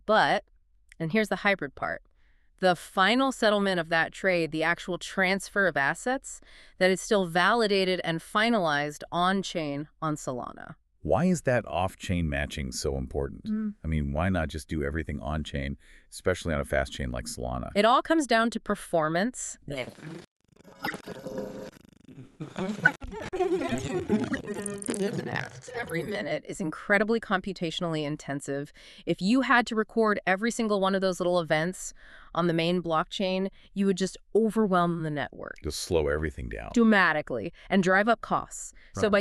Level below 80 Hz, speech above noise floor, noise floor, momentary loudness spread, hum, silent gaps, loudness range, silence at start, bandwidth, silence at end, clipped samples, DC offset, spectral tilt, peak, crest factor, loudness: -46 dBFS; 34 dB; -61 dBFS; 13 LU; none; 20.27-20.40 s; 6 LU; 0.1 s; 13.5 kHz; 0 s; under 0.1%; under 0.1%; -5 dB/octave; -6 dBFS; 22 dB; -28 LUFS